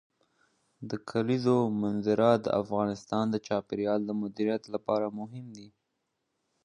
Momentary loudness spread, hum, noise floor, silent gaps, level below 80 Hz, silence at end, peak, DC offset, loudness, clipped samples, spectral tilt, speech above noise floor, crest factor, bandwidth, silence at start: 14 LU; none; -81 dBFS; none; -68 dBFS; 0.95 s; -10 dBFS; under 0.1%; -29 LUFS; under 0.1%; -7.5 dB/octave; 52 dB; 20 dB; 10.5 kHz; 0.8 s